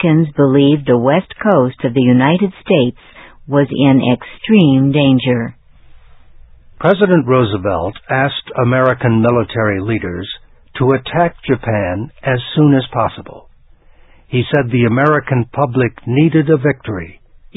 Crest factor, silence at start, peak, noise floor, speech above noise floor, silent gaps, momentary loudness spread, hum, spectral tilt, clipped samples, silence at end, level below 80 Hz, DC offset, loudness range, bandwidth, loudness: 14 dB; 0 s; 0 dBFS; -45 dBFS; 32 dB; none; 9 LU; none; -10.5 dB/octave; under 0.1%; 0.45 s; -42 dBFS; under 0.1%; 3 LU; 4 kHz; -14 LUFS